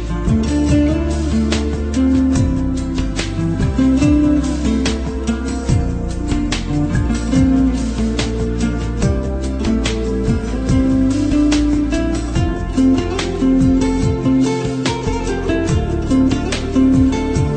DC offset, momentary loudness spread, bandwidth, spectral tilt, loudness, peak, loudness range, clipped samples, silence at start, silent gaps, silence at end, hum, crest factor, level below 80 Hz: under 0.1%; 6 LU; 9.4 kHz; -6.5 dB/octave; -17 LUFS; -2 dBFS; 2 LU; under 0.1%; 0 s; none; 0 s; none; 14 dB; -22 dBFS